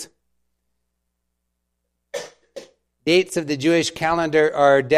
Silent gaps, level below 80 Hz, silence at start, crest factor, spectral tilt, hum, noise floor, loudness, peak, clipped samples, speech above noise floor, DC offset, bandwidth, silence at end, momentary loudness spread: none; -58 dBFS; 0 s; 20 dB; -4.5 dB/octave; 60 Hz at -60 dBFS; -76 dBFS; -19 LUFS; -2 dBFS; under 0.1%; 58 dB; under 0.1%; 14.5 kHz; 0 s; 18 LU